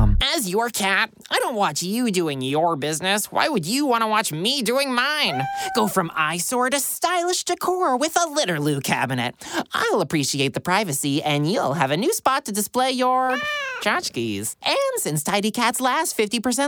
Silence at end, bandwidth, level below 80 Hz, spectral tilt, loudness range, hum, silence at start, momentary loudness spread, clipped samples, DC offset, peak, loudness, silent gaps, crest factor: 0 s; over 20 kHz; -36 dBFS; -3.5 dB/octave; 1 LU; none; 0 s; 4 LU; under 0.1%; under 0.1%; -4 dBFS; -21 LUFS; none; 18 dB